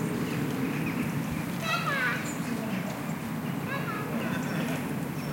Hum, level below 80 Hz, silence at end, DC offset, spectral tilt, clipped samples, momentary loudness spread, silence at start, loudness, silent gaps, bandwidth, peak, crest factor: none; -60 dBFS; 0 s; under 0.1%; -5.5 dB/octave; under 0.1%; 5 LU; 0 s; -31 LUFS; none; 17 kHz; -16 dBFS; 16 dB